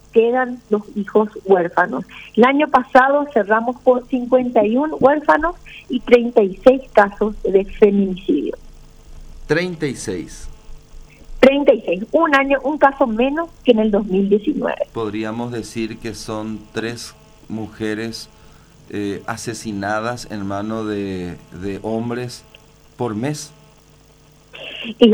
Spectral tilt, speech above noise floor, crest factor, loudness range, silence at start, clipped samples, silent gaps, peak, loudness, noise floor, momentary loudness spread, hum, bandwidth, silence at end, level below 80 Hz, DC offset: -5.5 dB/octave; 32 dB; 18 dB; 12 LU; 0.15 s; under 0.1%; none; 0 dBFS; -18 LUFS; -49 dBFS; 15 LU; none; 19 kHz; 0 s; -42 dBFS; under 0.1%